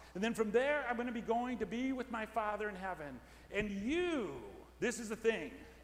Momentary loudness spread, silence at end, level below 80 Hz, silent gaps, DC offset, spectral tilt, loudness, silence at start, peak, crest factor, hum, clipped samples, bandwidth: 12 LU; 0 s; -60 dBFS; none; under 0.1%; -4.5 dB/octave; -38 LUFS; 0 s; -20 dBFS; 18 dB; none; under 0.1%; 16 kHz